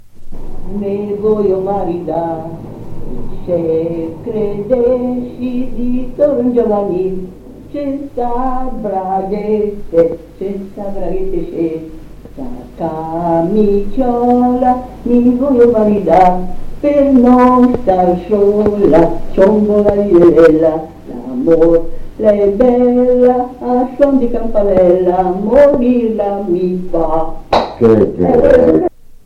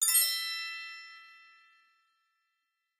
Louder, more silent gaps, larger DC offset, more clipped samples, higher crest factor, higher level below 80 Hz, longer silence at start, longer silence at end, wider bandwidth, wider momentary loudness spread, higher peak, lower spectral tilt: first, -12 LUFS vs -29 LUFS; neither; neither; neither; second, 12 dB vs 22 dB; first, -28 dBFS vs under -90 dBFS; about the same, 0.05 s vs 0 s; second, 0.1 s vs 1.65 s; second, 7.6 kHz vs 15.5 kHz; second, 15 LU vs 24 LU; first, 0 dBFS vs -14 dBFS; first, -9 dB/octave vs 6.5 dB/octave